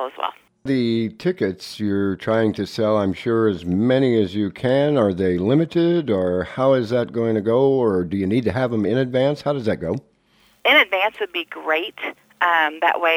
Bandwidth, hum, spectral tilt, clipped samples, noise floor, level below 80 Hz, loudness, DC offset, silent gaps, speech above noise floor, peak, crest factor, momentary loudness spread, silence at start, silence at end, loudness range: 15.5 kHz; none; -7 dB/octave; under 0.1%; -58 dBFS; -54 dBFS; -20 LUFS; under 0.1%; none; 39 dB; -2 dBFS; 18 dB; 8 LU; 0 s; 0 s; 2 LU